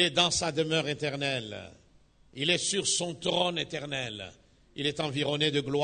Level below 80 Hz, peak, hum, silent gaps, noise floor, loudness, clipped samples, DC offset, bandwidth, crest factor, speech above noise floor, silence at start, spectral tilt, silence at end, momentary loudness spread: -60 dBFS; -8 dBFS; none; none; -61 dBFS; -29 LUFS; under 0.1%; under 0.1%; 9.6 kHz; 24 dB; 31 dB; 0 s; -3 dB/octave; 0 s; 16 LU